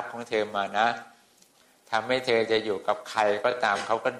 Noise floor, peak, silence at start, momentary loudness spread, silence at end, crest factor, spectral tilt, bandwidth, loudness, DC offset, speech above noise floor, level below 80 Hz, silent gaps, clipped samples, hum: -60 dBFS; -10 dBFS; 0 s; 6 LU; 0 s; 18 dB; -3.5 dB/octave; 13 kHz; -26 LUFS; under 0.1%; 34 dB; -70 dBFS; none; under 0.1%; none